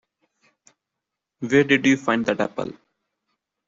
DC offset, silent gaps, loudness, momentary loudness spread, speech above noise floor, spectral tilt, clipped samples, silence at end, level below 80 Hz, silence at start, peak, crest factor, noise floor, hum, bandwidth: under 0.1%; none; -20 LUFS; 16 LU; 64 dB; -5 dB/octave; under 0.1%; 0.95 s; -64 dBFS; 1.4 s; -4 dBFS; 20 dB; -84 dBFS; none; 7.6 kHz